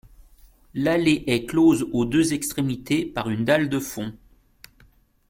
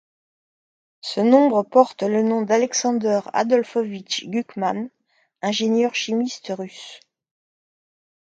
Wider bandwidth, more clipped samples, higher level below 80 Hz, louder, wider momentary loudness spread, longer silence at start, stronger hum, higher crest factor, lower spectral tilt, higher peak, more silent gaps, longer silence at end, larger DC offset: first, 16.5 kHz vs 9 kHz; neither; first, -50 dBFS vs -74 dBFS; about the same, -22 LUFS vs -21 LUFS; second, 10 LU vs 14 LU; second, 0.75 s vs 1.05 s; neither; about the same, 18 dB vs 22 dB; about the same, -5 dB/octave vs -4 dB/octave; second, -6 dBFS vs 0 dBFS; neither; second, 1.15 s vs 1.4 s; neither